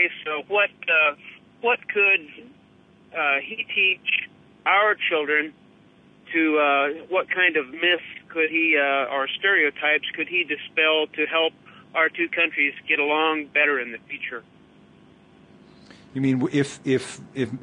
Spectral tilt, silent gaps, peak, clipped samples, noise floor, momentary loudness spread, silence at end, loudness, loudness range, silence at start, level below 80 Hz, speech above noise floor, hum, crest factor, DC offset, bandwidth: -4.5 dB/octave; none; -6 dBFS; under 0.1%; -54 dBFS; 11 LU; 0.05 s; -22 LUFS; 6 LU; 0 s; -70 dBFS; 31 dB; none; 18 dB; under 0.1%; 10.5 kHz